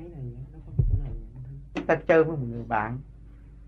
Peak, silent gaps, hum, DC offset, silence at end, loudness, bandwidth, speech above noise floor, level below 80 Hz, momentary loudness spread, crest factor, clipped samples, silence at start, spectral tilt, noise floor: -8 dBFS; none; none; under 0.1%; 0 s; -27 LUFS; 6.8 kHz; 22 dB; -36 dBFS; 21 LU; 20 dB; under 0.1%; 0 s; -9 dB/octave; -47 dBFS